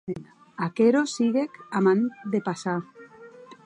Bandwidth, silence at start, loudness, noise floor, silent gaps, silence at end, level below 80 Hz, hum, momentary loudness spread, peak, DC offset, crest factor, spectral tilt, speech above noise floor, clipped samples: 10 kHz; 0.05 s; -25 LUFS; -47 dBFS; none; 0.1 s; -70 dBFS; none; 16 LU; -8 dBFS; under 0.1%; 16 dB; -6 dB/octave; 23 dB; under 0.1%